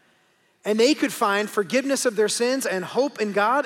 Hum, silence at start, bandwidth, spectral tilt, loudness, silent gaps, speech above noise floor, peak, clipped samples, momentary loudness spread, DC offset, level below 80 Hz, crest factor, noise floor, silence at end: none; 0.65 s; 17 kHz; -3 dB/octave; -22 LUFS; none; 41 dB; -8 dBFS; under 0.1%; 5 LU; under 0.1%; -80 dBFS; 16 dB; -63 dBFS; 0 s